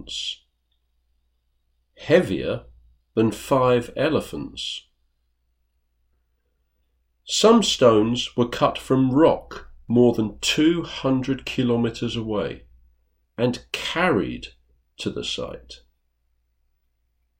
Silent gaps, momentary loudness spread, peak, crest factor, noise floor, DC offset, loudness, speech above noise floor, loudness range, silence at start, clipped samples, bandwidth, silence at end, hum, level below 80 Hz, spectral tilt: none; 16 LU; -4 dBFS; 20 dB; -70 dBFS; under 0.1%; -22 LUFS; 49 dB; 8 LU; 0 s; under 0.1%; 16 kHz; 1.65 s; none; -50 dBFS; -5 dB/octave